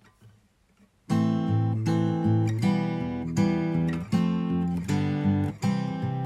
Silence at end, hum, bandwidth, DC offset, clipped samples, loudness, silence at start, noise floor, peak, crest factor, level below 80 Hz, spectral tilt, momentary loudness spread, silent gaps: 0 s; none; 12 kHz; under 0.1%; under 0.1%; -26 LUFS; 0.25 s; -62 dBFS; -12 dBFS; 14 dB; -54 dBFS; -8 dB/octave; 4 LU; none